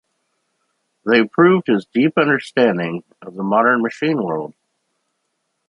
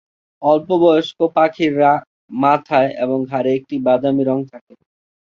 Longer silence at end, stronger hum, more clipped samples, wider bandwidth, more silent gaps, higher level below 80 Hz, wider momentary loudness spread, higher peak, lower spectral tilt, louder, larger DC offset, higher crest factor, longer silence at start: first, 1.2 s vs 0.8 s; neither; neither; first, 10.5 kHz vs 7.2 kHz; second, none vs 2.07-2.28 s; about the same, -64 dBFS vs -62 dBFS; first, 14 LU vs 7 LU; about the same, -2 dBFS vs -2 dBFS; about the same, -7 dB/octave vs -7.5 dB/octave; about the same, -17 LUFS vs -16 LUFS; neither; about the same, 16 dB vs 16 dB; first, 1.05 s vs 0.4 s